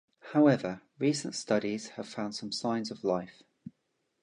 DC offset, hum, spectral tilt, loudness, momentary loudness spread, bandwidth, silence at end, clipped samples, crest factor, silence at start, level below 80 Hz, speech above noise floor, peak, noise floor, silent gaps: under 0.1%; none; -5 dB/octave; -31 LUFS; 24 LU; 10.5 kHz; 0.55 s; under 0.1%; 20 dB; 0.25 s; -74 dBFS; 48 dB; -12 dBFS; -79 dBFS; none